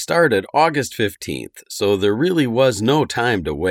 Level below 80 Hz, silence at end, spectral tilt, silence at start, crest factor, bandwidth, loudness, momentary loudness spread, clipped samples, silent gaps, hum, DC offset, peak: -46 dBFS; 0 s; -5 dB/octave; 0 s; 16 dB; 17 kHz; -18 LUFS; 11 LU; under 0.1%; none; none; under 0.1%; -2 dBFS